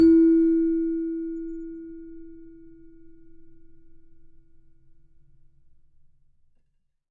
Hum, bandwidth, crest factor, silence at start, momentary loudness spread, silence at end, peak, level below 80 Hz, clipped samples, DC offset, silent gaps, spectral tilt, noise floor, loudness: none; 4.8 kHz; 16 dB; 0 s; 27 LU; 3.6 s; -10 dBFS; -52 dBFS; under 0.1%; under 0.1%; none; -9.5 dB/octave; -69 dBFS; -23 LUFS